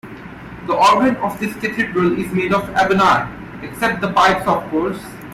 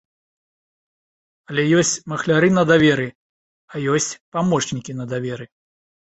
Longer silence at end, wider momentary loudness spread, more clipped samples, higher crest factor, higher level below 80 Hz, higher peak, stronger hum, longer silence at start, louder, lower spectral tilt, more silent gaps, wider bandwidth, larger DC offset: second, 0 s vs 0.6 s; first, 18 LU vs 14 LU; neither; second, 14 dB vs 20 dB; first, -44 dBFS vs -56 dBFS; about the same, -4 dBFS vs -2 dBFS; neither; second, 0.05 s vs 1.5 s; first, -16 LUFS vs -19 LUFS; about the same, -5 dB/octave vs -4.5 dB/octave; second, none vs 3.15-3.68 s, 4.20-4.32 s; first, 16 kHz vs 8.4 kHz; neither